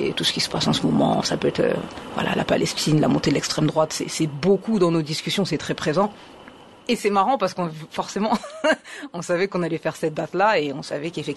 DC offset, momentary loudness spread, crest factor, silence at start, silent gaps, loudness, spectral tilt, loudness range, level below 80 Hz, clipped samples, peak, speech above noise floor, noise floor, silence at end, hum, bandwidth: under 0.1%; 9 LU; 16 dB; 0 s; none; -22 LUFS; -5 dB/octave; 3 LU; -54 dBFS; under 0.1%; -6 dBFS; 23 dB; -45 dBFS; 0 s; none; 12.5 kHz